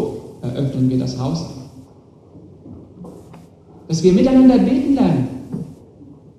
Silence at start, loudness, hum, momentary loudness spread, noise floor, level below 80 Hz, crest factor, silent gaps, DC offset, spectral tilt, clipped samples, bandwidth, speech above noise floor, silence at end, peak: 0 s; -16 LUFS; none; 25 LU; -46 dBFS; -46 dBFS; 18 dB; none; under 0.1%; -7.5 dB/octave; under 0.1%; 9.6 kHz; 31 dB; 0.25 s; 0 dBFS